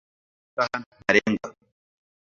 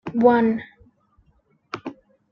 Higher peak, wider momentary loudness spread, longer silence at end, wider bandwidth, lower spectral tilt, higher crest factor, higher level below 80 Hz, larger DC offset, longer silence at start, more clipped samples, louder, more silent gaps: about the same, -2 dBFS vs -4 dBFS; second, 14 LU vs 22 LU; first, 0.75 s vs 0.4 s; first, 7.6 kHz vs 6.4 kHz; second, -4.5 dB/octave vs -8 dB/octave; first, 26 dB vs 20 dB; about the same, -62 dBFS vs -60 dBFS; neither; first, 0.55 s vs 0.05 s; neither; second, -24 LUFS vs -19 LUFS; first, 0.86-0.91 s vs none